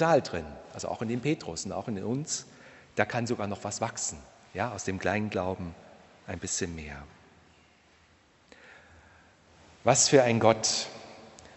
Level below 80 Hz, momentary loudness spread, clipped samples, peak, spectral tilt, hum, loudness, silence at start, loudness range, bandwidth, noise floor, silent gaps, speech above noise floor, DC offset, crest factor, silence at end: -58 dBFS; 20 LU; under 0.1%; -6 dBFS; -3.5 dB/octave; none; -29 LUFS; 0 s; 13 LU; 8.4 kHz; -62 dBFS; none; 33 dB; under 0.1%; 26 dB; 0.1 s